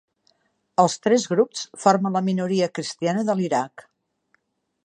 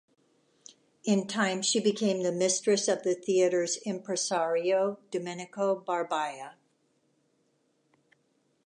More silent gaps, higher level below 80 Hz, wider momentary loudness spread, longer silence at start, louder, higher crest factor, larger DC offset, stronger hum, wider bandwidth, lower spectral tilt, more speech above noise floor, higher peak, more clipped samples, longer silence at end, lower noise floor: neither; first, -74 dBFS vs -84 dBFS; second, 7 LU vs 10 LU; second, 0.8 s vs 1.05 s; first, -22 LUFS vs -29 LUFS; about the same, 20 dB vs 18 dB; neither; neither; second, 9.8 kHz vs 11.5 kHz; first, -5 dB/octave vs -3.5 dB/octave; about the same, 47 dB vs 44 dB; first, -2 dBFS vs -12 dBFS; neither; second, 1.15 s vs 2.15 s; second, -68 dBFS vs -72 dBFS